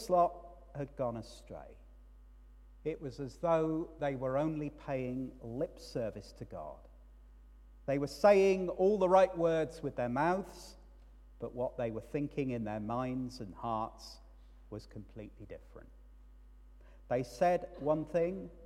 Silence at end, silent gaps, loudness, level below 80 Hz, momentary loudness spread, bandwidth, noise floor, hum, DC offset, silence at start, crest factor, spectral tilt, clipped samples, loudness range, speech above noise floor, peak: 0 s; none; -34 LUFS; -56 dBFS; 22 LU; 13.5 kHz; -56 dBFS; none; under 0.1%; 0 s; 22 dB; -7 dB/octave; under 0.1%; 13 LU; 22 dB; -14 dBFS